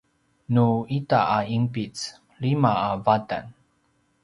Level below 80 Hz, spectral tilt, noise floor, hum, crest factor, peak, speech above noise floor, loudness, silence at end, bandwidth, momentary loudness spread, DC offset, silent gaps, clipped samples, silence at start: -58 dBFS; -7 dB/octave; -67 dBFS; none; 20 dB; -4 dBFS; 44 dB; -24 LUFS; 0.7 s; 11 kHz; 11 LU; under 0.1%; none; under 0.1%; 0.5 s